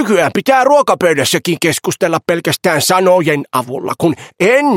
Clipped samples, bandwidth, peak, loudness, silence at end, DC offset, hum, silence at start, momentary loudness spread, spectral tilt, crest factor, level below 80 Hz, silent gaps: under 0.1%; 16.5 kHz; 0 dBFS; -13 LUFS; 0 s; under 0.1%; none; 0 s; 6 LU; -4 dB/octave; 12 dB; -56 dBFS; none